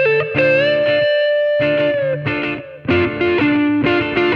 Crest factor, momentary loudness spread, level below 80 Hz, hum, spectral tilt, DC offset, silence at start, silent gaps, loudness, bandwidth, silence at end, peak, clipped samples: 14 dB; 6 LU; -46 dBFS; none; -7.5 dB/octave; under 0.1%; 0 s; none; -16 LUFS; 6.4 kHz; 0 s; -2 dBFS; under 0.1%